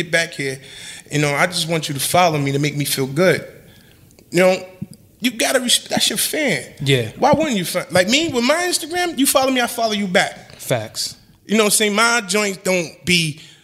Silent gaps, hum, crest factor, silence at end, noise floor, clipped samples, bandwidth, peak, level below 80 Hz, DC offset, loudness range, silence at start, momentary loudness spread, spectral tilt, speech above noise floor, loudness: none; none; 18 dB; 0.2 s; -48 dBFS; under 0.1%; 16 kHz; 0 dBFS; -54 dBFS; under 0.1%; 2 LU; 0 s; 10 LU; -3.5 dB/octave; 30 dB; -17 LUFS